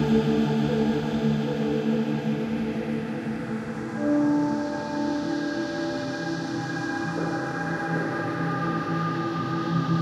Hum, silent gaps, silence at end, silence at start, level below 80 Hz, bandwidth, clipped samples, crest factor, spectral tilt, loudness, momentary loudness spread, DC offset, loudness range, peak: none; none; 0 s; 0 s; -54 dBFS; 10.5 kHz; under 0.1%; 16 dB; -7 dB/octave; -27 LUFS; 6 LU; under 0.1%; 3 LU; -10 dBFS